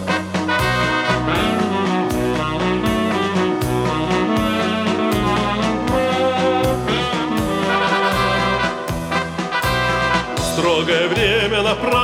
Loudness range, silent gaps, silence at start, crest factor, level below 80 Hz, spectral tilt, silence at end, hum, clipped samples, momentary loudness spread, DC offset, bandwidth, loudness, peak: 1 LU; none; 0 s; 14 dB; -36 dBFS; -5 dB/octave; 0 s; none; under 0.1%; 4 LU; under 0.1%; 17 kHz; -18 LUFS; -4 dBFS